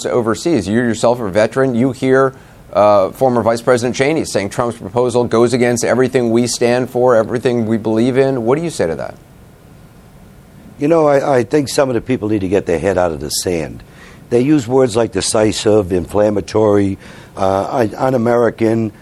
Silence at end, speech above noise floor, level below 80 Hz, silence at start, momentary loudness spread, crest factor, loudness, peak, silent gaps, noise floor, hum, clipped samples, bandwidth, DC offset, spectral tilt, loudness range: 0.1 s; 27 dB; -44 dBFS; 0 s; 6 LU; 14 dB; -15 LUFS; 0 dBFS; none; -41 dBFS; none; under 0.1%; 14 kHz; under 0.1%; -5.5 dB/octave; 3 LU